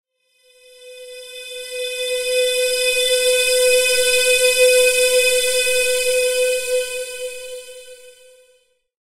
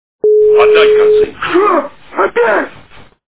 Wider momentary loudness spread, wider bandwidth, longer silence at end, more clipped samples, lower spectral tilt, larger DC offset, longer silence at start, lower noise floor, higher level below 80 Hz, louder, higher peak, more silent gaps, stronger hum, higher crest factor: first, 19 LU vs 9 LU; first, 16 kHz vs 4 kHz; first, 1.05 s vs 0.6 s; second, under 0.1% vs 0.1%; second, 2.5 dB/octave vs -8 dB/octave; second, under 0.1% vs 1%; first, 0.8 s vs 0.25 s; first, -59 dBFS vs -39 dBFS; second, -54 dBFS vs -46 dBFS; second, -16 LUFS vs -10 LUFS; second, -4 dBFS vs 0 dBFS; neither; neither; first, 16 dB vs 10 dB